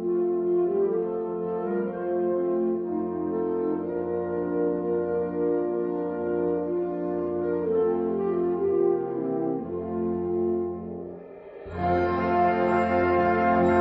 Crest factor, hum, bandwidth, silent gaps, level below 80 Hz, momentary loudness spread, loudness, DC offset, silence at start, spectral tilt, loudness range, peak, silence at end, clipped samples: 14 dB; none; 5.2 kHz; none; -56 dBFS; 7 LU; -26 LUFS; under 0.1%; 0 s; -7.5 dB/octave; 2 LU; -10 dBFS; 0 s; under 0.1%